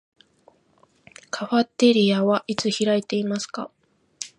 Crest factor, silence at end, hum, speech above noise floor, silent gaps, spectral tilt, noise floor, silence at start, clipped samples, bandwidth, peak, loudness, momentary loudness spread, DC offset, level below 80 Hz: 18 dB; 0.1 s; none; 40 dB; none; -5 dB/octave; -61 dBFS; 1.35 s; under 0.1%; 11 kHz; -6 dBFS; -22 LUFS; 16 LU; under 0.1%; -70 dBFS